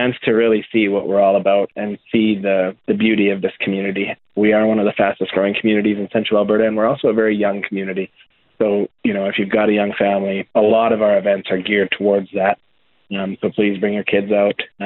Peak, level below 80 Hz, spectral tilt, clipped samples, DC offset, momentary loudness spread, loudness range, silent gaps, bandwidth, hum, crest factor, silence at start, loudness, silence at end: 0 dBFS; -58 dBFS; -11 dB/octave; under 0.1%; under 0.1%; 7 LU; 2 LU; none; 4.2 kHz; none; 16 dB; 0 s; -17 LUFS; 0 s